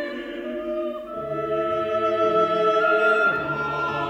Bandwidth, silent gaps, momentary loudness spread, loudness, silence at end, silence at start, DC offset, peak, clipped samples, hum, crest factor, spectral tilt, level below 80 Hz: 8.8 kHz; none; 12 LU; -23 LUFS; 0 s; 0 s; under 0.1%; -8 dBFS; under 0.1%; none; 14 dB; -6 dB/octave; -56 dBFS